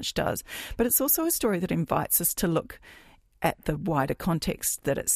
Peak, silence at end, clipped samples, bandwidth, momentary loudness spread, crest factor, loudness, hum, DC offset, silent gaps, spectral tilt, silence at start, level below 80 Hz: -8 dBFS; 0 s; under 0.1%; 15.5 kHz; 8 LU; 18 dB; -26 LUFS; none; under 0.1%; none; -4 dB/octave; 0 s; -46 dBFS